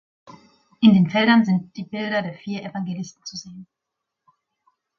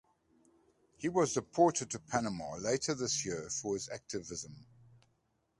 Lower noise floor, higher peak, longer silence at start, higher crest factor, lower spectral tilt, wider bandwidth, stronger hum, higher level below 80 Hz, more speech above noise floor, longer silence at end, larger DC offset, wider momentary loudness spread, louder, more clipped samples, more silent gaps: first, -83 dBFS vs -77 dBFS; first, -2 dBFS vs -14 dBFS; second, 0.8 s vs 1 s; about the same, 20 dB vs 22 dB; first, -6.5 dB/octave vs -4 dB/octave; second, 7 kHz vs 11.5 kHz; neither; about the same, -64 dBFS vs -66 dBFS; first, 62 dB vs 43 dB; first, 1.35 s vs 0.95 s; neither; first, 19 LU vs 12 LU; first, -20 LUFS vs -35 LUFS; neither; neither